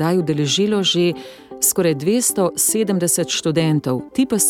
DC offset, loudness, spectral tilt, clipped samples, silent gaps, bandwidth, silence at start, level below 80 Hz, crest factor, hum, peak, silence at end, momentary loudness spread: under 0.1%; -18 LUFS; -4 dB/octave; under 0.1%; none; 17.5 kHz; 0 s; -58 dBFS; 14 dB; none; -4 dBFS; 0 s; 5 LU